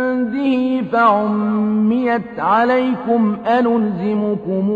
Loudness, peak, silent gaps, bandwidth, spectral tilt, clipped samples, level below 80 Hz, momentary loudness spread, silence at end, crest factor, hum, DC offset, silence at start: -17 LUFS; -2 dBFS; none; 5 kHz; -9 dB/octave; under 0.1%; -56 dBFS; 5 LU; 0 s; 14 dB; none; under 0.1%; 0 s